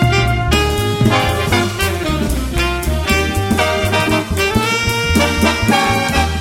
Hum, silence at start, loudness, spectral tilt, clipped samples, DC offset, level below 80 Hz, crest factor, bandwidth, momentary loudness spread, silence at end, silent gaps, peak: none; 0 s; -15 LUFS; -4.5 dB/octave; under 0.1%; under 0.1%; -24 dBFS; 14 dB; 17 kHz; 4 LU; 0 s; none; 0 dBFS